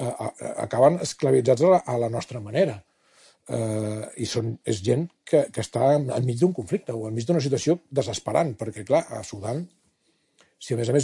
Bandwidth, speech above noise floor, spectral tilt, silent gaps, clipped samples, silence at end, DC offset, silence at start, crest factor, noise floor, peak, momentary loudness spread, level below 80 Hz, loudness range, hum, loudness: 11.5 kHz; 45 dB; -6 dB/octave; none; under 0.1%; 0 s; under 0.1%; 0 s; 18 dB; -69 dBFS; -6 dBFS; 12 LU; -64 dBFS; 5 LU; none; -25 LUFS